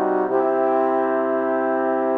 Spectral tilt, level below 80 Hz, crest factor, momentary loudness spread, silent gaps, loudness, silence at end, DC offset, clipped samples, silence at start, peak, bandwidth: -8.5 dB/octave; -76 dBFS; 12 dB; 2 LU; none; -20 LUFS; 0 s; under 0.1%; under 0.1%; 0 s; -8 dBFS; 3.9 kHz